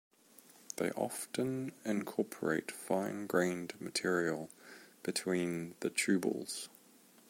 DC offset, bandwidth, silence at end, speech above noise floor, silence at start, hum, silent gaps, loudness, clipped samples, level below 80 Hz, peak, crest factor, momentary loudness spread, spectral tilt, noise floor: under 0.1%; 16.5 kHz; 0.6 s; 27 dB; 0.75 s; none; none; -36 LUFS; under 0.1%; -80 dBFS; -16 dBFS; 22 dB; 10 LU; -4 dB/octave; -63 dBFS